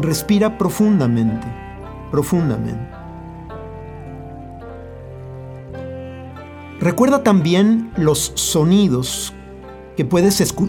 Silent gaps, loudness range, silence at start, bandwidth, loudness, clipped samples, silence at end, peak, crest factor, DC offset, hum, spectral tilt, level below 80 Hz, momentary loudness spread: none; 17 LU; 0 s; over 20 kHz; -17 LUFS; under 0.1%; 0 s; 0 dBFS; 18 dB; under 0.1%; none; -5.5 dB/octave; -42 dBFS; 20 LU